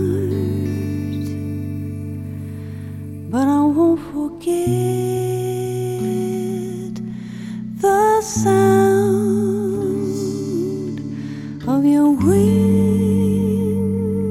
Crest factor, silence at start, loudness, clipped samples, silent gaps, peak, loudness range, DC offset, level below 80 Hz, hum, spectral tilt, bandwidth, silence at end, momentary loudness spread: 14 dB; 0 s; -19 LUFS; under 0.1%; none; -4 dBFS; 5 LU; 0.1%; -48 dBFS; none; -7 dB/octave; 16 kHz; 0 s; 15 LU